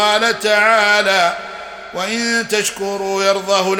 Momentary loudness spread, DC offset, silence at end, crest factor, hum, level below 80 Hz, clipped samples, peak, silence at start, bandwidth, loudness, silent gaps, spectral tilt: 14 LU; under 0.1%; 0 s; 16 dB; none; -56 dBFS; under 0.1%; 0 dBFS; 0 s; 17 kHz; -15 LUFS; none; -2 dB/octave